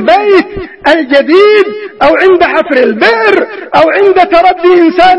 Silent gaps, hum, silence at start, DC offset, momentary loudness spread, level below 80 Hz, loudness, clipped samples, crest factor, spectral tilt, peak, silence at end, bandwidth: none; none; 0 s; 0.4%; 6 LU; -40 dBFS; -7 LUFS; 2%; 6 dB; -5.5 dB/octave; 0 dBFS; 0 s; 9.2 kHz